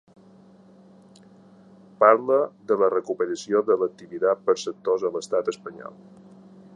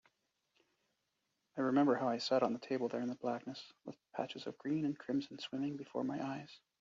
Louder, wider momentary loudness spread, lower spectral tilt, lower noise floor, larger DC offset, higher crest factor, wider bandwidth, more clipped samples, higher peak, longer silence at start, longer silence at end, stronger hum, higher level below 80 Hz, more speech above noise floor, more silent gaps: first, -23 LUFS vs -38 LUFS; second, 13 LU vs 16 LU; about the same, -4.5 dB/octave vs -4.5 dB/octave; second, -52 dBFS vs -85 dBFS; neither; about the same, 22 dB vs 20 dB; first, 10 kHz vs 7.4 kHz; neither; first, -2 dBFS vs -20 dBFS; first, 2 s vs 1.55 s; first, 0.85 s vs 0.25 s; neither; first, -76 dBFS vs -84 dBFS; second, 29 dB vs 47 dB; neither